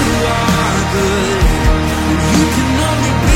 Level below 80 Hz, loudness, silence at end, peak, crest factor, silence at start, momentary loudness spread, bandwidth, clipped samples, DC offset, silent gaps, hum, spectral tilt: -18 dBFS; -13 LUFS; 0 s; 0 dBFS; 12 dB; 0 s; 2 LU; 16.5 kHz; under 0.1%; under 0.1%; none; none; -5 dB/octave